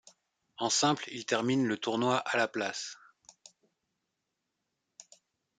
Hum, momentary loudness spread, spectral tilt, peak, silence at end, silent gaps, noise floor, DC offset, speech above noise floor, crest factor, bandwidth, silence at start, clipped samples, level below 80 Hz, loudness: none; 10 LU; -3 dB/octave; -14 dBFS; 2.65 s; none; -85 dBFS; under 0.1%; 54 dB; 20 dB; 9.6 kHz; 0.6 s; under 0.1%; -80 dBFS; -30 LUFS